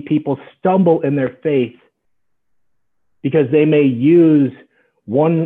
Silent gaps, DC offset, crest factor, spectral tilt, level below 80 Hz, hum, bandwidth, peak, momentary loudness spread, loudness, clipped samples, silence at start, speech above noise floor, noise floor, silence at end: none; under 0.1%; 14 dB; -11 dB/octave; -64 dBFS; none; 3.9 kHz; -2 dBFS; 10 LU; -15 LUFS; under 0.1%; 0.05 s; 60 dB; -74 dBFS; 0 s